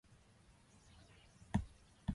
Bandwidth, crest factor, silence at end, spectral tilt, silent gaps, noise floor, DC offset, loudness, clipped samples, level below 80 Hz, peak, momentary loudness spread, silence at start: 11.5 kHz; 24 dB; 0 s; -7 dB/octave; none; -67 dBFS; under 0.1%; -45 LUFS; under 0.1%; -56 dBFS; -22 dBFS; 24 LU; 1.4 s